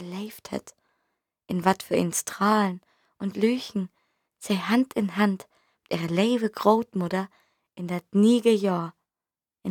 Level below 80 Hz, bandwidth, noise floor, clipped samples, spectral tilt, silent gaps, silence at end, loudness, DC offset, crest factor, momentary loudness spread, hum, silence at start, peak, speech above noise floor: -70 dBFS; 18.5 kHz; under -90 dBFS; under 0.1%; -5.5 dB/octave; none; 0 s; -25 LUFS; under 0.1%; 22 dB; 15 LU; none; 0 s; -4 dBFS; over 66 dB